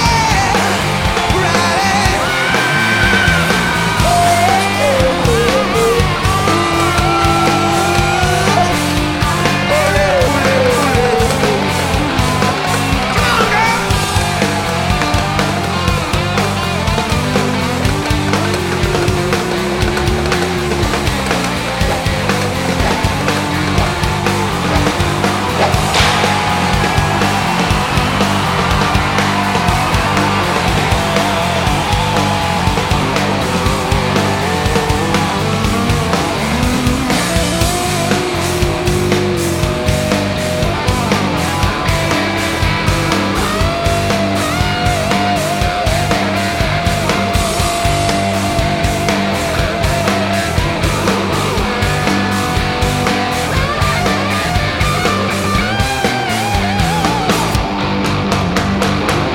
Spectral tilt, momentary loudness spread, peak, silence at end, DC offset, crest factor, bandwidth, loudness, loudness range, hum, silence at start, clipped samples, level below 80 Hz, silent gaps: -4.5 dB/octave; 3 LU; 0 dBFS; 0 s; under 0.1%; 14 dB; 17 kHz; -14 LUFS; 3 LU; none; 0 s; under 0.1%; -26 dBFS; none